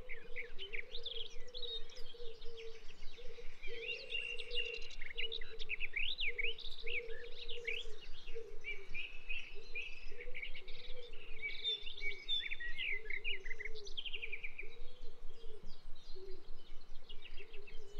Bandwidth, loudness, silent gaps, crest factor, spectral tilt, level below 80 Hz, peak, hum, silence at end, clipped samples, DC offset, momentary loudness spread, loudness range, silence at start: 6.4 kHz; -43 LUFS; none; 12 dB; -2.5 dB/octave; -46 dBFS; -24 dBFS; none; 0 s; under 0.1%; under 0.1%; 18 LU; 8 LU; 0 s